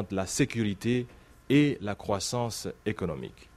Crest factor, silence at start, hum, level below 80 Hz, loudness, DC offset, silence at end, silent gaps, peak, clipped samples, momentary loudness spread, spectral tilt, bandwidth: 18 dB; 0 s; none; -56 dBFS; -29 LUFS; under 0.1%; 0.1 s; none; -12 dBFS; under 0.1%; 10 LU; -5 dB/octave; 14.5 kHz